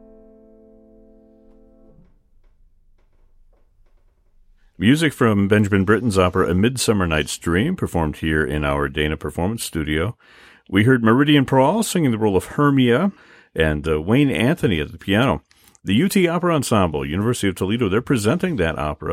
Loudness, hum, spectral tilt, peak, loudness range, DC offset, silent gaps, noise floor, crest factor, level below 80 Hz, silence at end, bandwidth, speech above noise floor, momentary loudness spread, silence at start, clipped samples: -19 LUFS; none; -5.5 dB/octave; -2 dBFS; 4 LU; under 0.1%; none; -55 dBFS; 18 dB; -38 dBFS; 0 s; 16 kHz; 37 dB; 7 LU; 4.8 s; under 0.1%